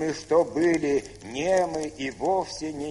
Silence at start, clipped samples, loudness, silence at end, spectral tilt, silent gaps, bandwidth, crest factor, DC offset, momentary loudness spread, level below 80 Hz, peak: 0 s; under 0.1%; -26 LUFS; 0 s; -5 dB/octave; none; 11.5 kHz; 16 dB; under 0.1%; 9 LU; -54 dBFS; -10 dBFS